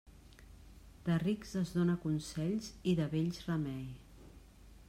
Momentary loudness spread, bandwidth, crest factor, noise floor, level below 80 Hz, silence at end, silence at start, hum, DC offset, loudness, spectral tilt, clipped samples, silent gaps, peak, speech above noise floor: 9 LU; 14.5 kHz; 16 dB; -57 dBFS; -58 dBFS; 0.05 s; 0.05 s; none; under 0.1%; -36 LUFS; -7 dB/octave; under 0.1%; none; -20 dBFS; 22 dB